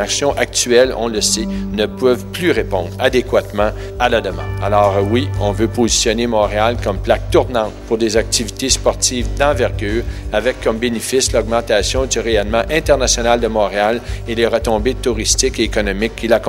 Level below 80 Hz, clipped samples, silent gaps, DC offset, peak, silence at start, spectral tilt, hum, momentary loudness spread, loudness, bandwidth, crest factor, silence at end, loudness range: -28 dBFS; under 0.1%; none; under 0.1%; 0 dBFS; 0 s; -3.5 dB/octave; none; 6 LU; -16 LUFS; 16.5 kHz; 16 dB; 0 s; 1 LU